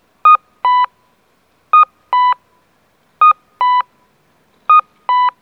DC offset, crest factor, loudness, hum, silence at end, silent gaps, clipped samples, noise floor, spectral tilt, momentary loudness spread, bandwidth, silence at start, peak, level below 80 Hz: under 0.1%; 14 dB; -13 LUFS; none; 0.1 s; none; under 0.1%; -57 dBFS; -1 dB/octave; 8 LU; 5.2 kHz; 0.25 s; 0 dBFS; -74 dBFS